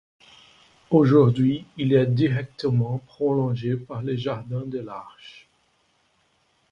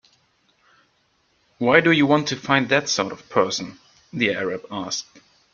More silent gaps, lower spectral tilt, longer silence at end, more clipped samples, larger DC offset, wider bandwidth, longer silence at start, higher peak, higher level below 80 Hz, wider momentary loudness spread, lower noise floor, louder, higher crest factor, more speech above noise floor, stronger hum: neither; first, -9.5 dB/octave vs -4 dB/octave; first, 1.4 s vs 0.5 s; neither; neither; about the same, 6.8 kHz vs 7.2 kHz; second, 0.9 s vs 1.6 s; second, -6 dBFS vs -2 dBFS; about the same, -60 dBFS vs -64 dBFS; about the same, 14 LU vs 12 LU; about the same, -66 dBFS vs -65 dBFS; about the same, -23 LUFS vs -21 LUFS; about the same, 18 dB vs 22 dB; about the same, 44 dB vs 44 dB; neither